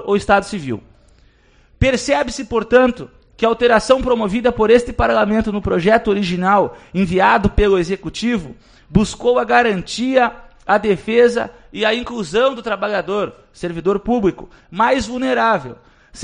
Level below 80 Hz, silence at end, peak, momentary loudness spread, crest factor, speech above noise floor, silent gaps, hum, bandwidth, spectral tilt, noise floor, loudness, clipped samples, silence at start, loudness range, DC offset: -34 dBFS; 0 s; 0 dBFS; 10 LU; 16 dB; 35 dB; none; none; 10 kHz; -5.5 dB/octave; -52 dBFS; -16 LUFS; under 0.1%; 0 s; 4 LU; under 0.1%